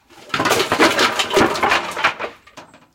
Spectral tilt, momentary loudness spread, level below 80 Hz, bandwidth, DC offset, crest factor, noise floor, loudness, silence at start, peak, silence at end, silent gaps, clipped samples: -2.5 dB/octave; 11 LU; -50 dBFS; 17 kHz; under 0.1%; 18 dB; -43 dBFS; -16 LUFS; 0.15 s; 0 dBFS; 0.3 s; none; under 0.1%